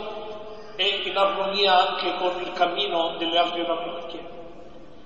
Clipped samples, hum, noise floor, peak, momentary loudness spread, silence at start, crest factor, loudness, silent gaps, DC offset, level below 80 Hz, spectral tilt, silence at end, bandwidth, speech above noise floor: under 0.1%; none; -45 dBFS; -6 dBFS; 19 LU; 0 s; 18 dB; -23 LUFS; none; 0.8%; -58 dBFS; -4 dB/octave; 0.05 s; 8.2 kHz; 22 dB